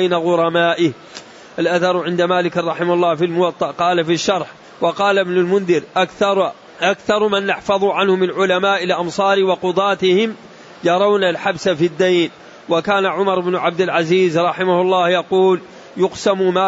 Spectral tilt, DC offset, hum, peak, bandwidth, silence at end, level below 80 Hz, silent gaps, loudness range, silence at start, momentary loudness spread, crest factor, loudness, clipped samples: -5 dB/octave; under 0.1%; none; -4 dBFS; 8 kHz; 0 s; -60 dBFS; none; 1 LU; 0 s; 6 LU; 12 dB; -16 LUFS; under 0.1%